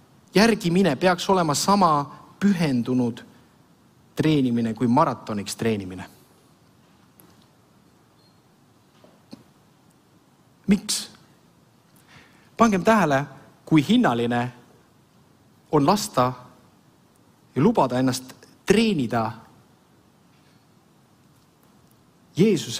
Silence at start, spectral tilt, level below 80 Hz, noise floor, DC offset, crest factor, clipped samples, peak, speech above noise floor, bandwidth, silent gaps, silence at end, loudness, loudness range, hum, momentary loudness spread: 0.35 s; -5.5 dB/octave; -56 dBFS; -57 dBFS; under 0.1%; 22 dB; under 0.1%; -4 dBFS; 37 dB; 16 kHz; none; 0 s; -22 LUFS; 8 LU; none; 17 LU